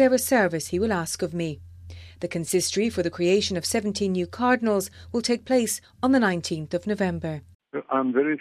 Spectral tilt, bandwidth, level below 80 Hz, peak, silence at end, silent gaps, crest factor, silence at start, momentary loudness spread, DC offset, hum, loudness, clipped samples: -4.5 dB/octave; 15.5 kHz; -54 dBFS; -8 dBFS; 0 s; 7.55-7.60 s; 16 dB; 0 s; 12 LU; under 0.1%; none; -25 LUFS; under 0.1%